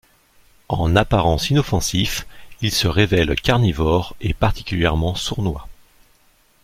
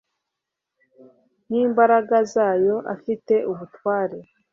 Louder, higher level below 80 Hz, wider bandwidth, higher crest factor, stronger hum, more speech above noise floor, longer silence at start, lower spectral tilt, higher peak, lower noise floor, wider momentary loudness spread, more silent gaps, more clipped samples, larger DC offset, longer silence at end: about the same, -19 LUFS vs -21 LUFS; first, -32 dBFS vs -70 dBFS; first, 16 kHz vs 7.4 kHz; about the same, 18 dB vs 18 dB; neither; second, 38 dB vs 63 dB; second, 0.7 s vs 1.5 s; second, -5 dB/octave vs -6.5 dB/octave; about the same, -2 dBFS vs -4 dBFS; second, -56 dBFS vs -83 dBFS; second, 9 LU vs 12 LU; neither; neither; neither; first, 0.9 s vs 0.3 s